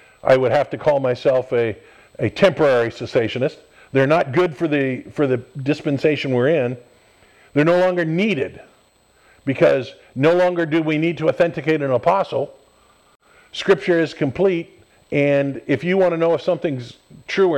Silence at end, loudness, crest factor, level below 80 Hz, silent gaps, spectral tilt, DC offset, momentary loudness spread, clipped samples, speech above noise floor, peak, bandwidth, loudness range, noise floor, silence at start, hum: 0 s; -19 LUFS; 18 dB; -58 dBFS; none; -7 dB/octave; under 0.1%; 9 LU; under 0.1%; 38 dB; -2 dBFS; 10 kHz; 2 LU; -56 dBFS; 0.25 s; none